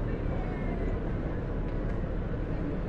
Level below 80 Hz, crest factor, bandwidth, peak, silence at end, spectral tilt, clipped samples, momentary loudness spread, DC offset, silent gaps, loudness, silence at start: -34 dBFS; 12 dB; 5 kHz; -20 dBFS; 0 s; -9.5 dB/octave; under 0.1%; 1 LU; under 0.1%; none; -34 LUFS; 0 s